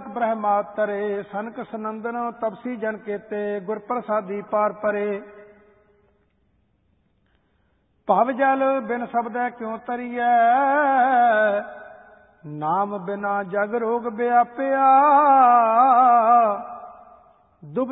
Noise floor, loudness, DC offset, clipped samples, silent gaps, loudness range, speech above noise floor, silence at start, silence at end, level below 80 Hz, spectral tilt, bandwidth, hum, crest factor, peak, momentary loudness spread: -66 dBFS; -21 LUFS; under 0.1%; under 0.1%; none; 11 LU; 45 dB; 0 s; 0 s; -70 dBFS; -10.5 dB/octave; 4 kHz; none; 16 dB; -6 dBFS; 16 LU